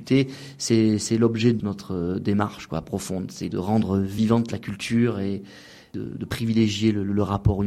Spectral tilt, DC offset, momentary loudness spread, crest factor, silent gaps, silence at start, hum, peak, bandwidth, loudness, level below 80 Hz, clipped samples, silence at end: -6 dB/octave; under 0.1%; 11 LU; 18 dB; none; 0 s; none; -6 dBFS; 14 kHz; -24 LUFS; -44 dBFS; under 0.1%; 0 s